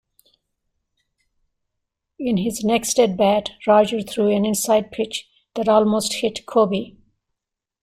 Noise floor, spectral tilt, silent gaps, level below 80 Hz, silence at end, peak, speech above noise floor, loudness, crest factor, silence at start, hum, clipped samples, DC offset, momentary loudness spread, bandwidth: -84 dBFS; -4.5 dB/octave; none; -58 dBFS; 0.9 s; -4 dBFS; 65 dB; -19 LUFS; 18 dB; 2.2 s; none; under 0.1%; under 0.1%; 10 LU; 16 kHz